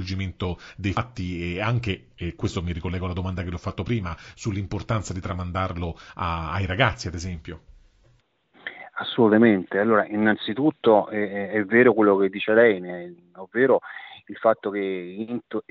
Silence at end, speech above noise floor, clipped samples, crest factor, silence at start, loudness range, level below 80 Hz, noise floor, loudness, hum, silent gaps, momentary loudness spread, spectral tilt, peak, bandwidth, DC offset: 0.1 s; 38 dB; under 0.1%; 20 dB; 0 s; 9 LU; -46 dBFS; -62 dBFS; -24 LUFS; none; none; 17 LU; -5 dB/octave; -4 dBFS; 8 kHz; under 0.1%